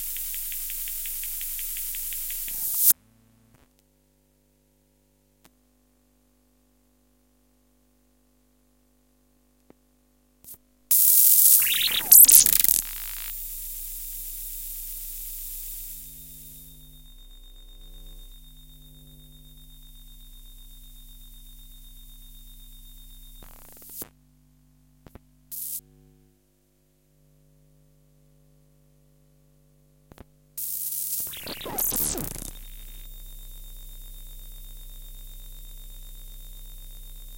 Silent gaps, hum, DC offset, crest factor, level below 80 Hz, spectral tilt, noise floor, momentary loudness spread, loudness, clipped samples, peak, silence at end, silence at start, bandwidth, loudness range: none; 50 Hz at -65 dBFS; under 0.1%; 28 dB; -46 dBFS; 0.5 dB/octave; -65 dBFS; 31 LU; -20 LUFS; under 0.1%; -2 dBFS; 0 s; 0 s; 17 kHz; 29 LU